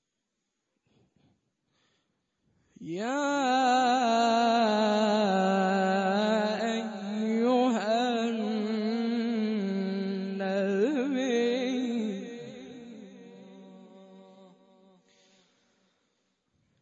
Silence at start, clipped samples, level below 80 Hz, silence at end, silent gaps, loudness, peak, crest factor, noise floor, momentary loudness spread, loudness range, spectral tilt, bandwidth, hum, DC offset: 2.8 s; under 0.1%; -82 dBFS; 2.6 s; none; -27 LUFS; -16 dBFS; 14 dB; -83 dBFS; 15 LU; 12 LU; -5.5 dB/octave; 8 kHz; none; under 0.1%